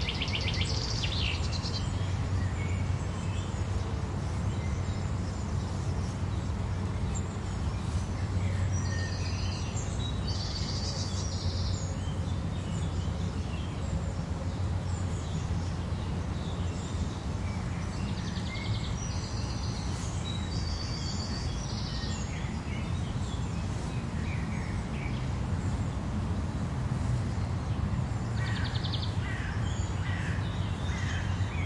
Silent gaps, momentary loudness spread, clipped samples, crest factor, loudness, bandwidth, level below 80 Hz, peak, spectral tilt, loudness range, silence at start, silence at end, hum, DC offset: none; 3 LU; under 0.1%; 16 dB; -33 LUFS; 11 kHz; -40 dBFS; -14 dBFS; -5.5 dB/octave; 2 LU; 0 s; 0 s; none; under 0.1%